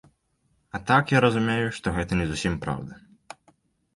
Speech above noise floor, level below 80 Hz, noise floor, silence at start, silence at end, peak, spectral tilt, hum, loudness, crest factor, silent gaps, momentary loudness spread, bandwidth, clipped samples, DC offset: 46 dB; -44 dBFS; -70 dBFS; 0.75 s; 1 s; -6 dBFS; -6 dB/octave; none; -24 LUFS; 20 dB; none; 14 LU; 11.5 kHz; under 0.1%; under 0.1%